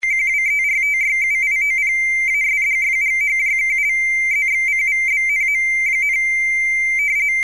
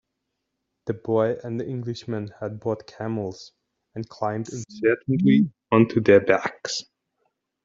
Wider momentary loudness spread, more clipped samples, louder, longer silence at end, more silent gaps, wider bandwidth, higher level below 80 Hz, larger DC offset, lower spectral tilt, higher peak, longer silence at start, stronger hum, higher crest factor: second, 0 LU vs 17 LU; neither; first, -15 LUFS vs -23 LUFS; second, 0 s vs 0.8 s; neither; first, 12 kHz vs 7.8 kHz; first, -50 dBFS vs -62 dBFS; first, 0.3% vs under 0.1%; second, 1 dB/octave vs -6 dB/octave; second, -12 dBFS vs -4 dBFS; second, 0.05 s vs 0.85 s; neither; second, 6 dB vs 22 dB